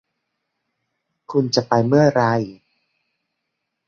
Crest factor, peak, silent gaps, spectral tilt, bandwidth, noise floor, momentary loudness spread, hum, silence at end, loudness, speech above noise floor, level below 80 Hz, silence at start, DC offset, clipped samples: 20 dB; -2 dBFS; none; -6 dB/octave; 7.2 kHz; -78 dBFS; 9 LU; none; 1.35 s; -18 LUFS; 61 dB; -60 dBFS; 1.3 s; under 0.1%; under 0.1%